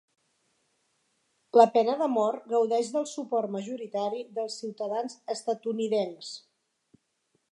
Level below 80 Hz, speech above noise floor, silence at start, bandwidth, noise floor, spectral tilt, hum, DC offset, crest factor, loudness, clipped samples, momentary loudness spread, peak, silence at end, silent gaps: -88 dBFS; 48 dB; 1.55 s; 11.5 kHz; -75 dBFS; -5 dB/octave; none; under 0.1%; 24 dB; -28 LUFS; under 0.1%; 13 LU; -4 dBFS; 1.15 s; none